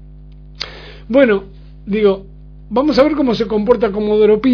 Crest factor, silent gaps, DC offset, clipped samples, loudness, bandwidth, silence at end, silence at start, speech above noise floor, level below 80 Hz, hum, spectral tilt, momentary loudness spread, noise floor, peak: 16 dB; none; under 0.1%; under 0.1%; -15 LUFS; 5.4 kHz; 0 s; 0 s; 23 dB; -38 dBFS; 50 Hz at -35 dBFS; -7 dB/octave; 15 LU; -37 dBFS; 0 dBFS